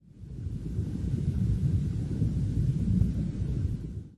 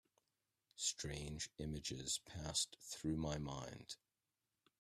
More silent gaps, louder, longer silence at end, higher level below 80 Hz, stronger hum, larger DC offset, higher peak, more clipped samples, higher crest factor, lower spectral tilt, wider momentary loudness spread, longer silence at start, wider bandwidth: neither; first, -30 LUFS vs -44 LUFS; second, 0 s vs 0.85 s; first, -36 dBFS vs -62 dBFS; neither; first, 0.1% vs under 0.1%; first, -12 dBFS vs -26 dBFS; neither; second, 16 dB vs 22 dB; first, -9.5 dB/octave vs -3 dB/octave; about the same, 10 LU vs 12 LU; second, 0.15 s vs 0.75 s; second, 10.5 kHz vs 15 kHz